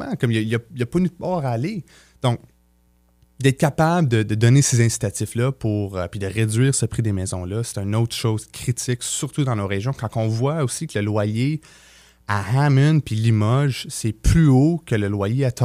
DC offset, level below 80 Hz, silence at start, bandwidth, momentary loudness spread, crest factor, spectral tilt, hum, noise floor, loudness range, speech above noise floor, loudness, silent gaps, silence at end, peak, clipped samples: under 0.1%; -38 dBFS; 0 s; 15.5 kHz; 10 LU; 16 dB; -6 dB/octave; none; -59 dBFS; 5 LU; 39 dB; -21 LUFS; none; 0 s; -4 dBFS; under 0.1%